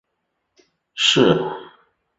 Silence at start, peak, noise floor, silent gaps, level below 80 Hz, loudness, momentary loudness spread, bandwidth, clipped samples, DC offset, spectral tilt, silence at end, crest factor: 0.95 s; -2 dBFS; -75 dBFS; none; -58 dBFS; -17 LUFS; 21 LU; 8 kHz; under 0.1%; under 0.1%; -4 dB/octave; 0.55 s; 20 dB